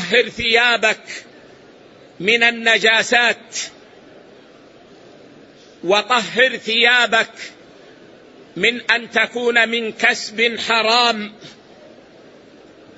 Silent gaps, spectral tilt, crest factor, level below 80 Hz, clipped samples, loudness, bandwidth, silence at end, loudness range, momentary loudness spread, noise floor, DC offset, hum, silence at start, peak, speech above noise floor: none; -2 dB/octave; 18 dB; -60 dBFS; under 0.1%; -15 LUFS; 8 kHz; 1.45 s; 4 LU; 14 LU; -45 dBFS; under 0.1%; none; 0 s; 0 dBFS; 28 dB